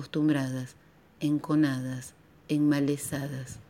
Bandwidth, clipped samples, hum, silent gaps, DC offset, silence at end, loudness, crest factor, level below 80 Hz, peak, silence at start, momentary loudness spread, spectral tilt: 16 kHz; under 0.1%; none; none; under 0.1%; 0.05 s; -29 LUFS; 16 dB; -64 dBFS; -14 dBFS; 0 s; 12 LU; -6 dB/octave